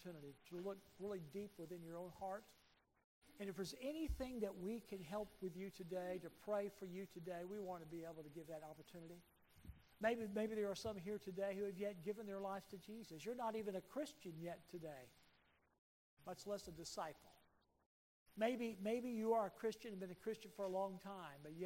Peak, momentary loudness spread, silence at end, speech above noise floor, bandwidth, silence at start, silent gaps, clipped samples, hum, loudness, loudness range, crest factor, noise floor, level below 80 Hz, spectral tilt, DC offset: -28 dBFS; 13 LU; 0 s; 30 dB; 16 kHz; 0 s; 3.04-3.22 s, 15.78-16.17 s, 17.86-18.26 s; under 0.1%; none; -48 LUFS; 8 LU; 22 dB; -77 dBFS; -68 dBFS; -5.5 dB/octave; under 0.1%